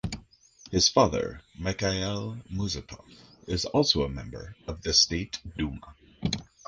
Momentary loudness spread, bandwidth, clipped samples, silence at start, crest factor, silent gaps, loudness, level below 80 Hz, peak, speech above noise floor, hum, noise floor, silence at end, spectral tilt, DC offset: 19 LU; 10.5 kHz; under 0.1%; 0.05 s; 24 dB; none; -27 LUFS; -44 dBFS; -6 dBFS; 27 dB; none; -55 dBFS; 0.25 s; -3.5 dB/octave; under 0.1%